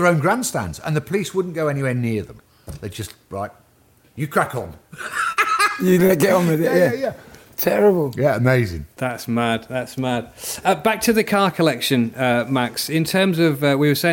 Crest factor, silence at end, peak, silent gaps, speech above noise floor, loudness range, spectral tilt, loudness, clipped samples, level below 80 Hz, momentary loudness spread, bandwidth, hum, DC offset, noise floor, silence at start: 16 dB; 0 s; -4 dBFS; none; 36 dB; 8 LU; -5.5 dB/octave; -19 LUFS; under 0.1%; -52 dBFS; 14 LU; 17 kHz; none; under 0.1%; -55 dBFS; 0 s